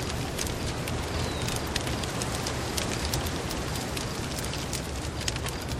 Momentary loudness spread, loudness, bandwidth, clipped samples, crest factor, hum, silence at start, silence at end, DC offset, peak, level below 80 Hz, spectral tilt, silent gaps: 3 LU; -31 LUFS; 16 kHz; under 0.1%; 20 dB; none; 0 s; 0 s; under 0.1%; -12 dBFS; -40 dBFS; -4 dB/octave; none